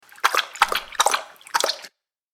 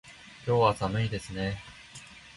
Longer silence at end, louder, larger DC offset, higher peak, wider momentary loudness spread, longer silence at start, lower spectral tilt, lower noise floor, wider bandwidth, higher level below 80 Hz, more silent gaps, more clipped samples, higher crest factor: first, 0.45 s vs 0.05 s; first, -22 LUFS vs -29 LUFS; neither; first, 0 dBFS vs -10 dBFS; second, 6 LU vs 21 LU; first, 0.25 s vs 0.05 s; second, 2 dB/octave vs -6 dB/octave; about the same, -48 dBFS vs -49 dBFS; first, 19 kHz vs 11.5 kHz; second, -58 dBFS vs -52 dBFS; neither; neither; about the same, 24 dB vs 22 dB